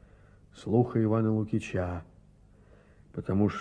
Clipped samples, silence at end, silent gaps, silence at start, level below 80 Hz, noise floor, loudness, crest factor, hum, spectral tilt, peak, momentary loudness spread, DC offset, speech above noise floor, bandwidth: under 0.1%; 0 s; none; 0.55 s; -56 dBFS; -58 dBFS; -29 LUFS; 20 dB; none; -8.5 dB/octave; -12 dBFS; 15 LU; under 0.1%; 30 dB; 9.6 kHz